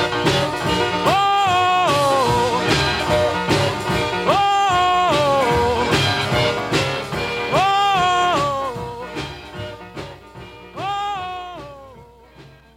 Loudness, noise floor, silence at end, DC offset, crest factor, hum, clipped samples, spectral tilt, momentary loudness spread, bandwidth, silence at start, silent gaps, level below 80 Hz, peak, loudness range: -18 LUFS; -45 dBFS; 0.3 s; under 0.1%; 16 dB; none; under 0.1%; -4.5 dB/octave; 16 LU; 16.5 kHz; 0 s; none; -42 dBFS; -4 dBFS; 12 LU